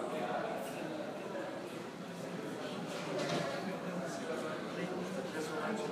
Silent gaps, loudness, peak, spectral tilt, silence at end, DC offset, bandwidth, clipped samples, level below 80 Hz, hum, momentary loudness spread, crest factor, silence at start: none; -40 LUFS; -24 dBFS; -5 dB/octave; 0 s; under 0.1%; 15.5 kHz; under 0.1%; -78 dBFS; none; 6 LU; 16 dB; 0 s